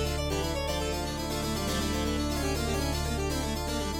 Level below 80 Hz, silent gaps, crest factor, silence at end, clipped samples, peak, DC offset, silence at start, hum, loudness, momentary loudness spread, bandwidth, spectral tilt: -36 dBFS; none; 12 dB; 0 s; under 0.1%; -18 dBFS; under 0.1%; 0 s; none; -30 LUFS; 2 LU; 17 kHz; -4.5 dB/octave